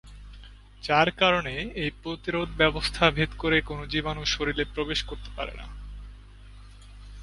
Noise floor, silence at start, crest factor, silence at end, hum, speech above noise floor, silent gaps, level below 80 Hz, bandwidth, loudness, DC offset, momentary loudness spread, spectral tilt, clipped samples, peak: -47 dBFS; 0.05 s; 26 dB; 0 s; 50 Hz at -40 dBFS; 20 dB; none; -42 dBFS; 11.5 kHz; -26 LUFS; under 0.1%; 18 LU; -4.5 dB/octave; under 0.1%; -2 dBFS